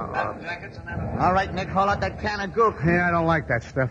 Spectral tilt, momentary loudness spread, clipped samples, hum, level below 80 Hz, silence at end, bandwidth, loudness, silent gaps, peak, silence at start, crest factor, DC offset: -7 dB/octave; 12 LU; under 0.1%; none; -42 dBFS; 0 s; 8 kHz; -24 LUFS; none; -8 dBFS; 0 s; 16 dB; under 0.1%